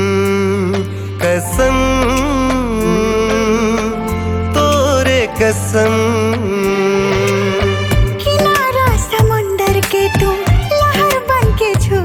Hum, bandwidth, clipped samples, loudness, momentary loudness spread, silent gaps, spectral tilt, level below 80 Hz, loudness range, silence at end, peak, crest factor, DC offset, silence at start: none; 19 kHz; under 0.1%; -14 LUFS; 4 LU; none; -5.5 dB/octave; -24 dBFS; 1 LU; 0 s; -2 dBFS; 12 dB; under 0.1%; 0 s